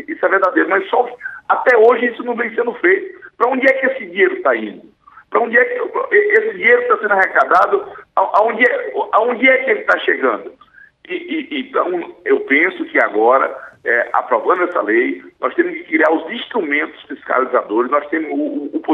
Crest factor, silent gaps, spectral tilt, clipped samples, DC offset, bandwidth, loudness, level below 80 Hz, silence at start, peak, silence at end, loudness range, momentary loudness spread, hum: 14 dB; none; -5.5 dB/octave; under 0.1%; under 0.1%; 6.8 kHz; -15 LUFS; -68 dBFS; 0 s; 0 dBFS; 0 s; 4 LU; 10 LU; none